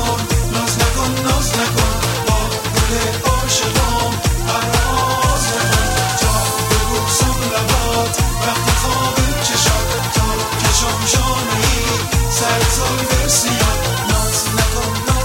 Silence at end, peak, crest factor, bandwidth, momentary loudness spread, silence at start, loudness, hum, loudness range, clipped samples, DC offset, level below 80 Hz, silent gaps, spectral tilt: 0 s; 0 dBFS; 16 dB; 16.5 kHz; 3 LU; 0 s; -15 LUFS; none; 1 LU; under 0.1%; under 0.1%; -22 dBFS; none; -3.5 dB/octave